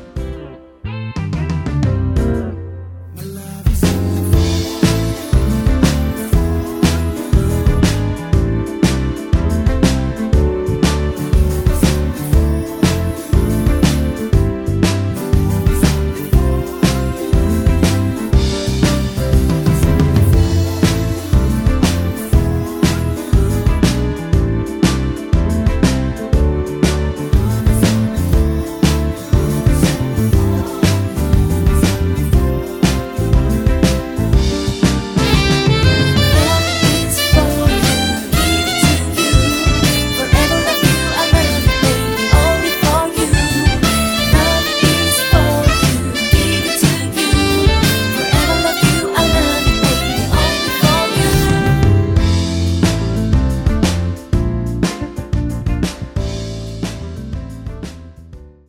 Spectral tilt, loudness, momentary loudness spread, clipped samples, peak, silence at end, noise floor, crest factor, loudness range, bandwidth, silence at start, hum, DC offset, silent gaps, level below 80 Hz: -5 dB/octave; -15 LUFS; 7 LU; under 0.1%; 0 dBFS; 0.2 s; -37 dBFS; 14 dB; 4 LU; 19 kHz; 0 s; none; under 0.1%; none; -20 dBFS